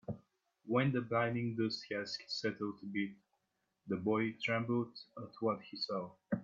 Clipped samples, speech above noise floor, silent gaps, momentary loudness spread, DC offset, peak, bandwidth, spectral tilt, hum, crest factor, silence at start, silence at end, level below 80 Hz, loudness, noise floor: under 0.1%; 46 dB; none; 10 LU; under 0.1%; -20 dBFS; 7.6 kHz; -6.5 dB/octave; none; 18 dB; 0.1 s; 0 s; -78 dBFS; -38 LUFS; -84 dBFS